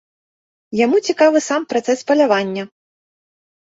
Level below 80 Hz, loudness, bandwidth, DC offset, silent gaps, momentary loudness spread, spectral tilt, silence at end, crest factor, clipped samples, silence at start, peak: -66 dBFS; -16 LUFS; 8 kHz; under 0.1%; none; 12 LU; -4 dB/octave; 0.95 s; 16 dB; under 0.1%; 0.7 s; -2 dBFS